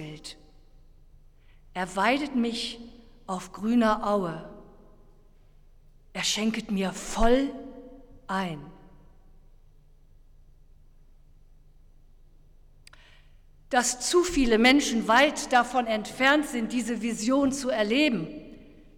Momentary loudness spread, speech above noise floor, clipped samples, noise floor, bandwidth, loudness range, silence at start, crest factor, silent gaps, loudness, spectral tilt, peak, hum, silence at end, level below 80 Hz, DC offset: 19 LU; 29 dB; under 0.1%; -54 dBFS; 17.5 kHz; 11 LU; 0 s; 20 dB; none; -25 LUFS; -3.5 dB/octave; -8 dBFS; none; 0.35 s; -46 dBFS; under 0.1%